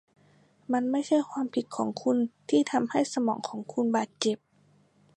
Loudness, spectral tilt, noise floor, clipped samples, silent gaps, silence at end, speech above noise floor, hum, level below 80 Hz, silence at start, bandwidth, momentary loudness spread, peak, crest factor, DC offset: -29 LUFS; -4.5 dB/octave; -64 dBFS; under 0.1%; none; 0.8 s; 36 dB; none; -80 dBFS; 0.7 s; 11 kHz; 6 LU; -8 dBFS; 20 dB; under 0.1%